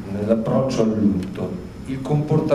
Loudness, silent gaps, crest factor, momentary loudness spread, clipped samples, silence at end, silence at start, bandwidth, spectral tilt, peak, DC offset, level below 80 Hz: -21 LUFS; none; 16 dB; 10 LU; under 0.1%; 0 s; 0 s; 11.5 kHz; -8 dB/octave; -6 dBFS; 0.2%; -44 dBFS